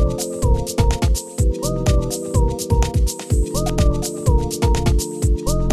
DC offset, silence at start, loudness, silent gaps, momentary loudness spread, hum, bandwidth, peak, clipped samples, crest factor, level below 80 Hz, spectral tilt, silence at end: under 0.1%; 0 s; -20 LUFS; none; 3 LU; none; 13.5 kHz; -4 dBFS; under 0.1%; 14 dB; -20 dBFS; -5.5 dB/octave; 0 s